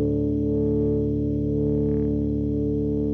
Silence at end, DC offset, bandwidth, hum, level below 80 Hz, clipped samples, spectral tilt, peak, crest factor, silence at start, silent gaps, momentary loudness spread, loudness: 0 s; under 0.1%; 3.4 kHz; 60 Hz at -55 dBFS; -34 dBFS; under 0.1%; -12.5 dB/octave; -12 dBFS; 10 dB; 0 s; none; 2 LU; -24 LUFS